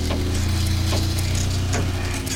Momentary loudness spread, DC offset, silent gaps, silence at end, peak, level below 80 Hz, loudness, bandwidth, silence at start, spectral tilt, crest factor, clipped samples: 2 LU; 0.6%; none; 0 s; -10 dBFS; -30 dBFS; -23 LUFS; 17 kHz; 0 s; -4.5 dB/octave; 12 dB; under 0.1%